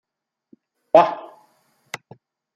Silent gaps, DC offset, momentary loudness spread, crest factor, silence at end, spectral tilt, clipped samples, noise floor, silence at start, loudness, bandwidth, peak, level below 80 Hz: none; under 0.1%; 21 LU; 24 dB; 0.6 s; -5 dB/octave; under 0.1%; -77 dBFS; 0.95 s; -17 LUFS; 10 kHz; 0 dBFS; -70 dBFS